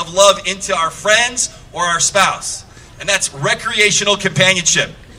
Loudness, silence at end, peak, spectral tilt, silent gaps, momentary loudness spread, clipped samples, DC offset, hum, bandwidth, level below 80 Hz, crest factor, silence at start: -14 LUFS; 0 s; 0 dBFS; -1.5 dB/octave; none; 9 LU; under 0.1%; under 0.1%; none; over 20 kHz; -44 dBFS; 16 dB; 0 s